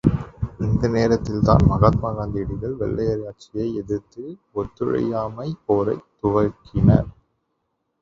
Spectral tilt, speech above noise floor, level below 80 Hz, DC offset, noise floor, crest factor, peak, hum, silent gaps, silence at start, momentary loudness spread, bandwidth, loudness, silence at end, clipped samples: -9 dB/octave; 53 dB; -34 dBFS; under 0.1%; -74 dBFS; 20 dB; 0 dBFS; none; none; 0.05 s; 13 LU; 7.4 kHz; -22 LUFS; 0.9 s; under 0.1%